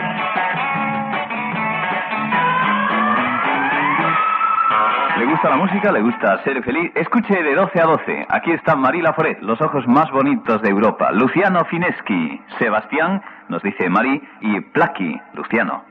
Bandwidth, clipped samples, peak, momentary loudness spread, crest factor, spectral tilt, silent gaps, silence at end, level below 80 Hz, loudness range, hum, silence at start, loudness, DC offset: 5.6 kHz; under 0.1%; -4 dBFS; 6 LU; 14 dB; -8.5 dB/octave; none; 0.1 s; -60 dBFS; 3 LU; none; 0 s; -17 LUFS; under 0.1%